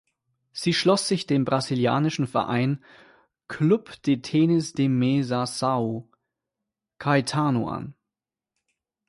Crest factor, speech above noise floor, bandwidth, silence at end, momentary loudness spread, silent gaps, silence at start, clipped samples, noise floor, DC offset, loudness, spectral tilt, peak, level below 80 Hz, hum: 18 dB; 66 dB; 11.5 kHz; 1.15 s; 10 LU; none; 0.55 s; under 0.1%; -89 dBFS; under 0.1%; -24 LUFS; -6 dB/octave; -8 dBFS; -62 dBFS; none